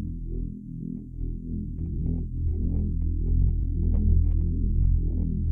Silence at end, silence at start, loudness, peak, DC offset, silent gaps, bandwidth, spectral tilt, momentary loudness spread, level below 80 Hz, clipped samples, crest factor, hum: 0 s; 0 s; -29 LUFS; -10 dBFS; under 0.1%; none; 0.9 kHz; -14.5 dB/octave; 12 LU; -26 dBFS; under 0.1%; 14 dB; none